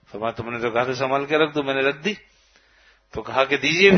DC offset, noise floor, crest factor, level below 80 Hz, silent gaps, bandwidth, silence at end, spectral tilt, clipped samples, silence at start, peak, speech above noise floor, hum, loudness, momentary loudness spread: under 0.1%; -57 dBFS; 20 dB; -56 dBFS; none; 6.6 kHz; 0 s; -5 dB/octave; under 0.1%; 0.15 s; -2 dBFS; 36 dB; none; -22 LUFS; 10 LU